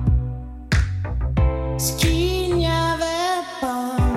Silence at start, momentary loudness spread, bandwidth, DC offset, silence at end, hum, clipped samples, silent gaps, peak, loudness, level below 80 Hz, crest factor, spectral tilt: 0 s; 6 LU; 16 kHz; under 0.1%; 0 s; none; under 0.1%; none; -8 dBFS; -22 LUFS; -26 dBFS; 14 dB; -5 dB/octave